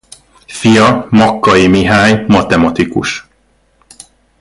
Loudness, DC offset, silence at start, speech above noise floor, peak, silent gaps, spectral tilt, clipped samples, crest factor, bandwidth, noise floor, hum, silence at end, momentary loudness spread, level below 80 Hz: -9 LUFS; under 0.1%; 0.5 s; 45 dB; 0 dBFS; none; -5.5 dB/octave; under 0.1%; 12 dB; 11.5 kHz; -54 dBFS; none; 1.2 s; 9 LU; -36 dBFS